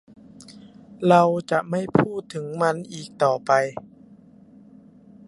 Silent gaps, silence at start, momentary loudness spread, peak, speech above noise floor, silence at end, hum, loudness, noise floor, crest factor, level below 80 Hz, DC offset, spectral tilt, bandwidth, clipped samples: none; 0.4 s; 14 LU; -2 dBFS; 28 dB; 1.45 s; none; -22 LUFS; -50 dBFS; 22 dB; -62 dBFS; under 0.1%; -6.5 dB/octave; 11.5 kHz; under 0.1%